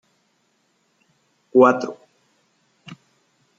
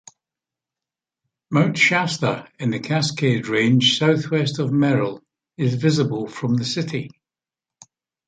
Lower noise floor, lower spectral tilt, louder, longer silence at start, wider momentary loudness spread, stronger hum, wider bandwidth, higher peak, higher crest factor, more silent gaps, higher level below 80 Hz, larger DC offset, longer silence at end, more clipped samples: second, -67 dBFS vs under -90 dBFS; about the same, -6.5 dB/octave vs -5.5 dB/octave; about the same, -18 LUFS vs -20 LUFS; about the same, 1.55 s vs 1.5 s; first, 29 LU vs 10 LU; neither; second, 7.4 kHz vs 9.4 kHz; about the same, -2 dBFS vs -4 dBFS; about the same, 22 dB vs 18 dB; neither; second, -72 dBFS vs -62 dBFS; neither; second, 0.65 s vs 1.2 s; neither